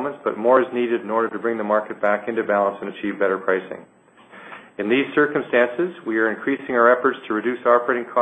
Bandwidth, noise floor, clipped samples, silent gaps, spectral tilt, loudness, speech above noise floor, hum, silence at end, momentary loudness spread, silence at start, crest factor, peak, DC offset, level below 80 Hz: 8.4 kHz; -46 dBFS; under 0.1%; none; -7.5 dB/octave; -21 LUFS; 26 dB; none; 0 s; 10 LU; 0 s; 20 dB; -2 dBFS; under 0.1%; -70 dBFS